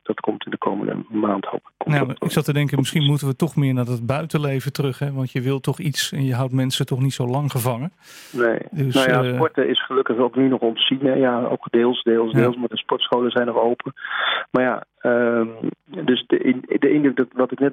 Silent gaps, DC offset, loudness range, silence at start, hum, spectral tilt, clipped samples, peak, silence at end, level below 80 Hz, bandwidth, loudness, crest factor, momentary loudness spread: none; under 0.1%; 3 LU; 0.05 s; none; -6 dB/octave; under 0.1%; -4 dBFS; 0 s; -62 dBFS; 16.5 kHz; -21 LUFS; 16 dB; 7 LU